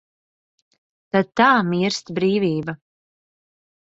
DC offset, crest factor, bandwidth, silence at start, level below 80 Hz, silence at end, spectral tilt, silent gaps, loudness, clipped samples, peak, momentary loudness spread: under 0.1%; 20 dB; 8 kHz; 1.15 s; -62 dBFS; 1.05 s; -5.5 dB/octave; none; -19 LUFS; under 0.1%; -2 dBFS; 12 LU